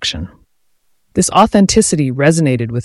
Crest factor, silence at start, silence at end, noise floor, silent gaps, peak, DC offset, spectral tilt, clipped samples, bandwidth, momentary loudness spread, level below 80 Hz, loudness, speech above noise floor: 14 dB; 0 s; 0 s; -63 dBFS; none; 0 dBFS; under 0.1%; -4.5 dB/octave; under 0.1%; 12 kHz; 12 LU; -38 dBFS; -12 LUFS; 51 dB